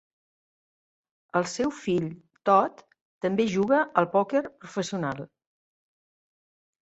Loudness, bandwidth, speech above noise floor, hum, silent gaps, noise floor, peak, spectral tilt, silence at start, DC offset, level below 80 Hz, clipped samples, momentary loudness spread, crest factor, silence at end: -26 LUFS; 8.2 kHz; over 65 dB; none; 3.01-3.21 s; under -90 dBFS; -6 dBFS; -5.5 dB/octave; 1.35 s; under 0.1%; -68 dBFS; under 0.1%; 10 LU; 24 dB; 1.6 s